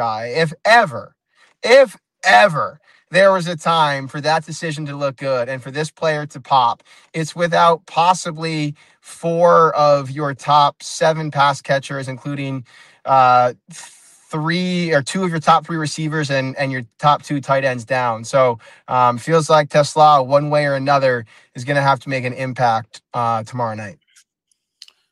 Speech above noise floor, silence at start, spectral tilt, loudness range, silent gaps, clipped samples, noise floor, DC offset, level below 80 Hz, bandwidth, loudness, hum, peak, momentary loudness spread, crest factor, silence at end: 53 dB; 0 s; -5 dB/octave; 5 LU; none; under 0.1%; -69 dBFS; under 0.1%; -64 dBFS; 12.5 kHz; -17 LUFS; none; -2 dBFS; 14 LU; 16 dB; 1.2 s